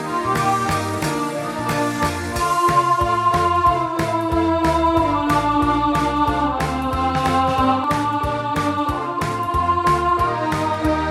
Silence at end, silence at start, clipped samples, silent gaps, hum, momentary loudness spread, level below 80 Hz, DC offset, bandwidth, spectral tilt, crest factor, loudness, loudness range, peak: 0 s; 0 s; under 0.1%; none; none; 5 LU; -36 dBFS; under 0.1%; 16.5 kHz; -5.5 dB/octave; 14 dB; -19 LUFS; 2 LU; -4 dBFS